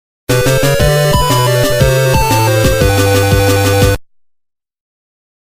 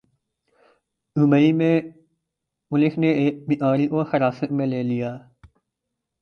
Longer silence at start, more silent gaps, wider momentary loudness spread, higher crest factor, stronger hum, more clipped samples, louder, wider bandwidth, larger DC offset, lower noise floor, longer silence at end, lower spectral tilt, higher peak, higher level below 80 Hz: second, 0.3 s vs 1.15 s; neither; second, 2 LU vs 11 LU; about the same, 12 dB vs 16 dB; neither; neither; first, -11 LUFS vs -21 LUFS; first, 16.5 kHz vs 6.4 kHz; neither; second, -65 dBFS vs -81 dBFS; first, 1.55 s vs 1 s; second, -5 dB/octave vs -9 dB/octave; first, 0 dBFS vs -6 dBFS; first, -24 dBFS vs -64 dBFS